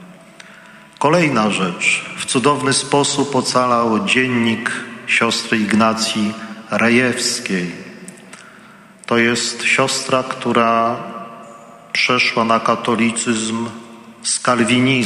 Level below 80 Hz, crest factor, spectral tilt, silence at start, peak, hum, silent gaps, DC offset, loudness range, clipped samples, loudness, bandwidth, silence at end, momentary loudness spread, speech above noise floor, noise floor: -60 dBFS; 18 dB; -3.5 dB/octave; 0 s; 0 dBFS; none; none; under 0.1%; 3 LU; under 0.1%; -16 LUFS; 12.5 kHz; 0 s; 13 LU; 26 dB; -43 dBFS